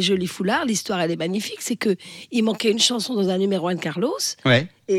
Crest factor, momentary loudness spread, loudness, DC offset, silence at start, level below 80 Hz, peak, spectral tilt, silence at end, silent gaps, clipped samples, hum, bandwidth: 16 dB; 7 LU; -22 LUFS; under 0.1%; 0 s; -64 dBFS; -6 dBFS; -4 dB/octave; 0 s; none; under 0.1%; none; 16 kHz